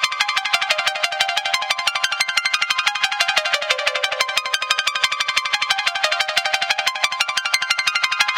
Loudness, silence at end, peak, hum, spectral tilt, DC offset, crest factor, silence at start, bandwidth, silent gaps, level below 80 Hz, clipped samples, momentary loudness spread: -18 LUFS; 0 s; 0 dBFS; none; 2.5 dB/octave; under 0.1%; 20 dB; 0 s; 17 kHz; none; -68 dBFS; under 0.1%; 2 LU